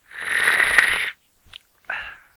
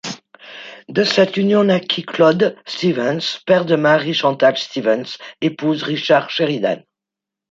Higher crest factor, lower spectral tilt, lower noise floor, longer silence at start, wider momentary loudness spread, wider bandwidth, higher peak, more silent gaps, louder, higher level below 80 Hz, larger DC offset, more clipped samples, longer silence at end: first, 24 dB vs 16 dB; second, 0 dB/octave vs -5.5 dB/octave; second, -48 dBFS vs -85 dBFS; about the same, 0.15 s vs 0.05 s; about the same, 16 LU vs 14 LU; first, over 20 kHz vs 7.8 kHz; about the same, 0 dBFS vs -2 dBFS; neither; about the same, -18 LUFS vs -17 LUFS; first, -54 dBFS vs -64 dBFS; neither; neither; second, 0.2 s vs 0.7 s